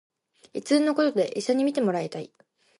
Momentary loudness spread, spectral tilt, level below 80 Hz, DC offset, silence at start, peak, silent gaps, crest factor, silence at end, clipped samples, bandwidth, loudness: 16 LU; -5 dB/octave; -80 dBFS; under 0.1%; 0.55 s; -10 dBFS; none; 16 dB; 0.55 s; under 0.1%; 11.5 kHz; -25 LUFS